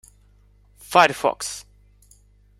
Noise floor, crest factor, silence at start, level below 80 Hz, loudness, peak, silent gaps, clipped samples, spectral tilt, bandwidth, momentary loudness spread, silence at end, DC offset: -55 dBFS; 24 dB; 0.9 s; -56 dBFS; -20 LUFS; 0 dBFS; none; under 0.1%; -2.5 dB/octave; 16 kHz; 15 LU; 1 s; under 0.1%